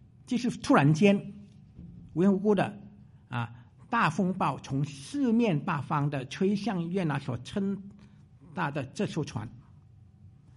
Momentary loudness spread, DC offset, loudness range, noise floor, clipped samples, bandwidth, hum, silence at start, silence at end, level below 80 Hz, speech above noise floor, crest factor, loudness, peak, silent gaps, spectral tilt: 16 LU; under 0.1%; 7 LU; -55 dBFS; under 0.1%; 11.5 kHz; none; 0.3 s; 0.3 s; -62 dBFS; 27 dB; 20 dB; -29 LUFS; -10 dBFS; none; -7 dB/octave